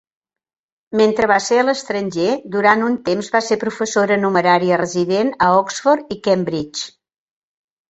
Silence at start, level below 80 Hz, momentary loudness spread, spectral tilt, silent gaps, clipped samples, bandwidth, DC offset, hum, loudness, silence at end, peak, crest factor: 0.9 s; -56 dBFS; 8 LU; -4.5 dB/octave; none; under 0.1%; 8.2 kHz; under 0.1%; none; -17 LUFS; 1.05 s; -2 dBFS; 16 dB